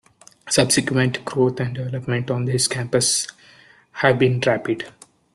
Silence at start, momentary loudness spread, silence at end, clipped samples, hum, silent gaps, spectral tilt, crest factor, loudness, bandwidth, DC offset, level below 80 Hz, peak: 0.45 s; 10 LU; 0.45 s; under 0.1%; none; none; -4 dB/octave; 20 dB; -20 LUFS; 12.5 kHz; under 0.1%; -56 dBFS; -2 dBFS